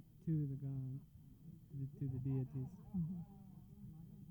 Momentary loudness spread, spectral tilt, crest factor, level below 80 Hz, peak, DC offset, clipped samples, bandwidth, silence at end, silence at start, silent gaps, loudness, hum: 18 LU; -11.5 dB/octave; 14 dB; -66 dBFS; -30 dBFS; under 0.1%; under 0.1%; over 20 kHz; 0 s; 0 s; none; -45 LUFS; none